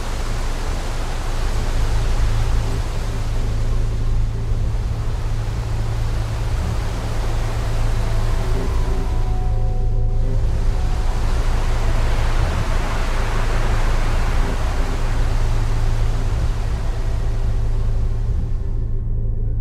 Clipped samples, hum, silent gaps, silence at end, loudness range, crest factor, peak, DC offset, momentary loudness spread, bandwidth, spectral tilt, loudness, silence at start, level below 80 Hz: under 0.1%; none; none; 0 s; 2 LU; 12 dB; -4 dBFS; under 0.1%; 3 LU; 11.5 kHz; -6 dB/octave; -23 LUFS; 0 s; -18 dBFS